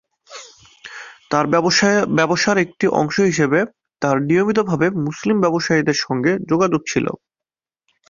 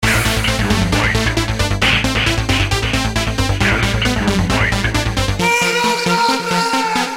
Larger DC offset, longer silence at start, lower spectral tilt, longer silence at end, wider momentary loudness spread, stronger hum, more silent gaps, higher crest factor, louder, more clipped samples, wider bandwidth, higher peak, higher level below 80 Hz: second, under 0.1% vs 0.2%; first, 0.3 s vs 0 s; about the same, -5 dB/octave vs -4 dB/octave; first, 0.95 s vs 0 s; first, 19 LU vs 4 LU; neither; neither; about the same, 16 dB vs 16 dB; second, -18 LUFS vs -15 LUFS; neither; second, 7.4 kHz vs 16.5 kHz; about the same, -2 dBFS vs 0 dBFS; second, -56 dBFS vs -26 dBFS